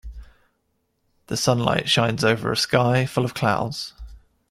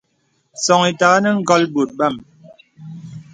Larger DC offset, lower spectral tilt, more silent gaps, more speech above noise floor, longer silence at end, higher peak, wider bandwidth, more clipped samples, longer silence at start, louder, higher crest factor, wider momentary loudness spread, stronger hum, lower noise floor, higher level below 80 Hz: neither; about the same, -4.5 dB/octave vs -4 dB/octave; neither; about the same, 50 dB vs 49 dB; first, 0.3 s vs 0.1 s; about the same, -2 dBFS vs 0 dBFS; first, 15 kHz vs 9.6 kHz; neither; second, 0.05 s vs 0.55 s; second, -21 LUFS vs -16 LUFS; about the same, 20 dB vs 18 dB; second, 10 LU vs 22 LU; neither; first, -71 dBFS vs -65 dBFS; first, -46 dBFS vs -62 dBFS